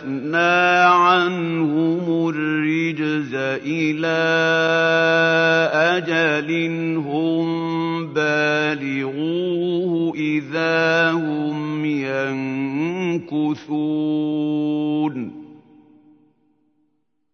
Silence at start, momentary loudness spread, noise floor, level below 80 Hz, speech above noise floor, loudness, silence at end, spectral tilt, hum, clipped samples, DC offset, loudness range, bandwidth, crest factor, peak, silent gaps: 0 s; 8 LU; -70 dBFS; -74 dBFS; 51 dB; -19 LUFS; 1.8 s; -6 dB/octave; none; under 0.1%; under 0.1%; 6 LU; 6.6 kHz; 16 dB; -4 dBFS; none